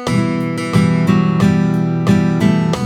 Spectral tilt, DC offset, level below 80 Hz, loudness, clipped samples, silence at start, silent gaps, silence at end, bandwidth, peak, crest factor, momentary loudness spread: -7.5 dB/octave; under 0.1%; -44 dBFS; -14 LUFS; under 0.1%; 0 s; none; 0 s; 12.5 kHz; 0 dBFS; 14 dB; 3 LU